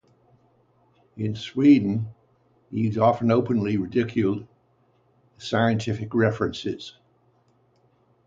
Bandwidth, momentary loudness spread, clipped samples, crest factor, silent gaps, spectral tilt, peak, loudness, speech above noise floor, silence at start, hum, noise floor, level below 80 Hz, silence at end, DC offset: 7.8 kHz; 15 LU; under 0.1%; 18 dB; none; -7.5 dB/octave; -6 dBFS; -23 LUFS; 41 dB; 1.15 s; 60 Hz at -50 dBFS; -64 dBFS; -56 dBFS; 1.35 s; under 0.1%